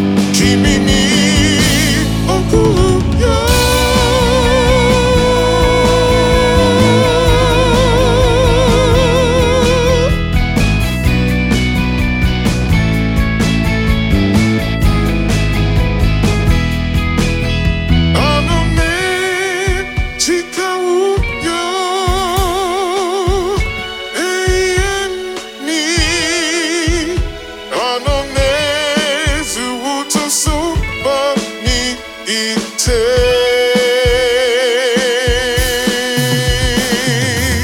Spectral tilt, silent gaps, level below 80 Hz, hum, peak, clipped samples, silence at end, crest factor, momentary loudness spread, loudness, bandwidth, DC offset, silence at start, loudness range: -4.5 dB/octave; none; -20 dBFS; none; 0 dBFS; under 0.1%; 0 s; 12 dB; 6 LU; -13 LUFS; 18 kHz; under 0.1%; 0 s; 5 LU